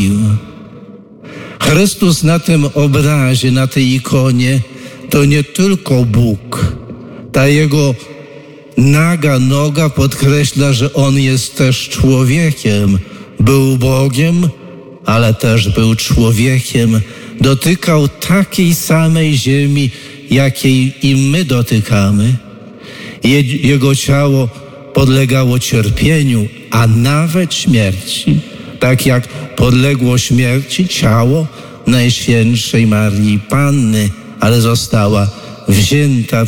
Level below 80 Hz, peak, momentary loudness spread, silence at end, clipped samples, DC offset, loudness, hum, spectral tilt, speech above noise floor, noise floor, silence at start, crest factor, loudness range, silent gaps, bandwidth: -32 dBFS; 0 dBFS; 7 LU; 0 s; under 0.1%; under 0.1%; -11 LUFS; none; -5.5 dB/octave; 24 dB; -34 dBFS; 0 s; 10 dB; 1 LU; none; 18 kHz